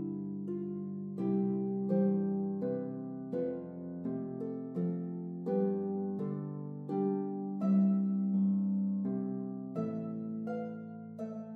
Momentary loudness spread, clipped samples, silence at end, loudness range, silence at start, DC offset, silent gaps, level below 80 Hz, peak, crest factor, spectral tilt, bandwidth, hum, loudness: 10 LU; under 0.1%; 0 s; 4 LU; 0 s; under 0.1%; none; -84 dBFS; -20 dBFS; 14 dB; -12.5 dB/octave; 2.8 kHz; none; -35 LUFS